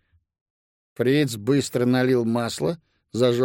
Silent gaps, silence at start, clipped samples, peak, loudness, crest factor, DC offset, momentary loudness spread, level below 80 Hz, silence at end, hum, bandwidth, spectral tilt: none; 1 s; under 0.1%; -8 dBFS; -22 LUFS; 16 dB; under 0.1%; 7 LU; -62 dBFS; 0 s; none; 16.5 kHz; -6 dB/octave